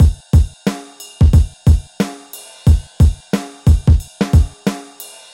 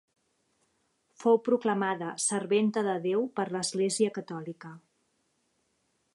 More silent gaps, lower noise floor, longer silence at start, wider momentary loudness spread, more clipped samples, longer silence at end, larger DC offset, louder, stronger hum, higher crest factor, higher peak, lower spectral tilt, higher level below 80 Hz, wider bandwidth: neither; second, -37 dBFS vs -75 dBFS; second, 0 s vs 1.2 s; first, 18 LU vs 14 LU; neither; second, 0.3 s vs 1.35 s; neither; first, -16 LUFS vs -29 LUFS; neither; second, 12 dB vs 18 dB; first, -2 dBFS vs -12 dBFS; first, -7 dB/octave vs -4 dB/octave; first, -18 dBFS vs -82 dBFS; first, 16.5 kHz vs 11.5 kHz